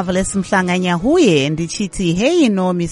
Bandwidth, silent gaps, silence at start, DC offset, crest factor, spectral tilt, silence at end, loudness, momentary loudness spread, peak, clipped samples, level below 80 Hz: 11.5 kHz; none; 0 s; under 0.1%; 14 dB; -5 dB/octave; 0 s; -15 LUFS; 7 LU; -2 dBFS; under 0.1%; -38 dBFS